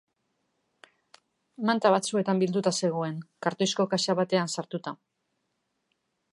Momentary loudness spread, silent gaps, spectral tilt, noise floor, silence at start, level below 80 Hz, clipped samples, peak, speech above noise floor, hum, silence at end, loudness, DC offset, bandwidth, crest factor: 11 LU; none; -4.5 dB/octave; -78 dBFS; 1.6 s; -78 dBFS; under 0.1%; -8 dBFS; 52 dB; none; 1.4 s; -27 LUFS; under 0.1%; 11.5 kHz; 22 dB